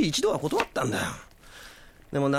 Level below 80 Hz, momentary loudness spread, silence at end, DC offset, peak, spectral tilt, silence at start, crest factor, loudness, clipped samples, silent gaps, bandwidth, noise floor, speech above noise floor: -52 dBFS; 21 LU; 0 s; under 0.1%; -10 dBFS; -4.5 dB/octave; 0 s; 18 dB; -28 LUFS; under 0.1%; none; 16.5 kHz; -49 dBFS; 22 dB